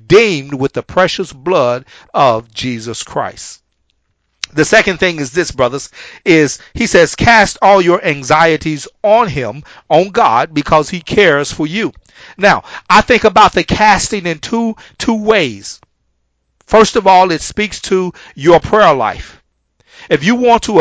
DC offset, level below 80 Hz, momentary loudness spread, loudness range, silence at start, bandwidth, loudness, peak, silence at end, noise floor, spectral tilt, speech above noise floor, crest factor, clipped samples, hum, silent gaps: under 0.1%; -38 dBFS; 12 LU; 5 LU; 0.1 s; 8 kHz; -12 LUFS; 0 dBFS; 0 s; -64 dBFS; -4.5 dB/octave; 52 dB; 12 dB; 0.6%; none; none